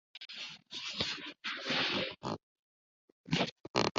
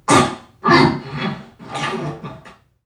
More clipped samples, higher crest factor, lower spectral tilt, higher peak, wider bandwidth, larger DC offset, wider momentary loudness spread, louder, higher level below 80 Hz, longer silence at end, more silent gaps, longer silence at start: neither; first, 26 dB vs 18 dB; second, -2 dB/octave vs -4.5 dB/octave; second, -12 dBFS vs 0 dBFS; second, 8 kHz vs 15 kHz; neither; second, 12 LU vs 20 LU; second, -36 LUFS vs -18 LUFS; second, -68 dBFS vs -48 dBFS; second, 0 s vs 0.35 s; first, 2.43-3.24 s, 3.52-3.64 s, 3.70-3.74 s, 3.91-3.95 s vs none; about the same, 0.15 s vs 0.1 s